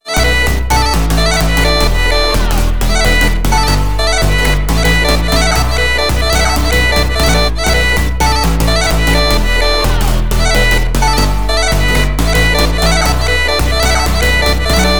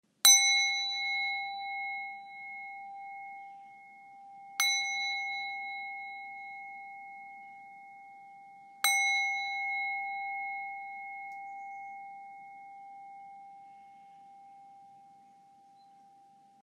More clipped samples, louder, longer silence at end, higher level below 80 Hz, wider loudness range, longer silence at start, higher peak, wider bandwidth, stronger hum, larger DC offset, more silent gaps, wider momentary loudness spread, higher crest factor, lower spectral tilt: neither; first, -12 LUFS vs -29 LUFS; second, 0 s vs 1.45 s; first, -14 dBFS vs under -90 dBFS; second, 1 LU vs 18 LU; second, 0 s vs 0.25 s; first, 0 dBFS vs -6 dBFS; first, over 20 kHz vs 14 kHz; neither; first, 8% vs under 0.1%; neither; second, 2 LU vs 25 LU; second, 12 dB vs 28 dB; first, -4 dB/octave vs 5 dB/octave